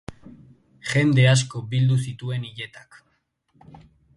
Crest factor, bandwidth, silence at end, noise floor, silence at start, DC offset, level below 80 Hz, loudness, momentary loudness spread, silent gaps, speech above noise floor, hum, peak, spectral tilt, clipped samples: 18 dB; 11.5 kHz; 1.4 s; -70 dBFS; 0.1 s; under 0.1%; -56 dBFS; -21 LUFS; 19 LU; none; 49 dB; none; -6 dBFS; -5.5 dB/octave; under 0.1%